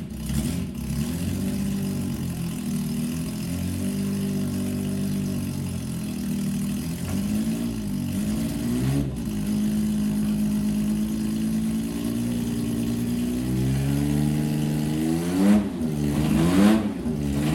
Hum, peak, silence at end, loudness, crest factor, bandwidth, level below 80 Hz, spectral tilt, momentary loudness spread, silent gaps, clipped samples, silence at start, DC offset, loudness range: none; -8 dBFS; 0 s; -25 LUFS; 16 dB; 17 kHz; -40 dBFS; -6.5 dB/octave; 7 LU; none; under 0.1%; 0 s; under 0.1%; 5 LU